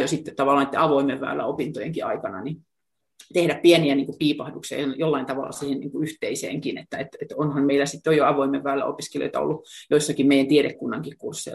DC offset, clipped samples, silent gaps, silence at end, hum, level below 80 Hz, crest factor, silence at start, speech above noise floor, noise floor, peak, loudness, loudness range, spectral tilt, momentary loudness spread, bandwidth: under 0.1%; under 0.1%; none; 0 s; none; -64 dBFS; 18 dB; 0 s; 60 dB; -83 dBFS; -4 dBFS; -23 LUFS; 4 LU; -5 dB/octave; 13 LU; 12.5 kHz